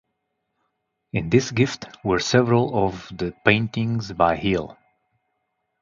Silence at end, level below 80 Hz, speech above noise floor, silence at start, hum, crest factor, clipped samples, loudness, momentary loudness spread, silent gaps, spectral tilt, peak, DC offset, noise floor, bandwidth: 1.1 s; -48 dBFS; 55 dB; 1.15 s; none; 22 dB; under 0.1%; -22 LUFS; 11 LU; none; -5.5 dB/octave; 0 dBFS; under 0.1%; -76 dBFS; 7.6 kHz